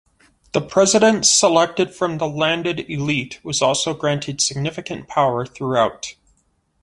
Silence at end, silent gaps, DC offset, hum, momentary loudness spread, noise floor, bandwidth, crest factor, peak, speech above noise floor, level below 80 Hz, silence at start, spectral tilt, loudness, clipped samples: 0.7 s; none; under 0.1%; none; 12 LU; -64 dBFS; 11.5 kHz; 18 dB; -2 dBFS; 45 dB; -54 dBFS; 0.55 s; -3 dB/octave; -18 LUFS; under 0.1%